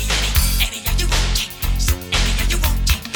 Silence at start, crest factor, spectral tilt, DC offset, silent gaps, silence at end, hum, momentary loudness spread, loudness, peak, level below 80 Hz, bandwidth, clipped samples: 0 s; 16 dB; -2.5 dB/octave; under 0.1%; none; 0 s; none; 4 LU; -19 LUFS; -2 dBFS; -20 dBFS; over 20 kHz; under 0.1%